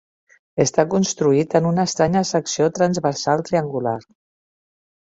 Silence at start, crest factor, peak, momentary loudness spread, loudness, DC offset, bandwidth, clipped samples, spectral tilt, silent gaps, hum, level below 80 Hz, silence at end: 0.55 s; 18 dB; -2 dBFS; 6 LU; -19 LUFS; under 0.1%; 8 kHz; under 0.1%; -5 dB/octave; none; none; -56 dBFS; 1.15 s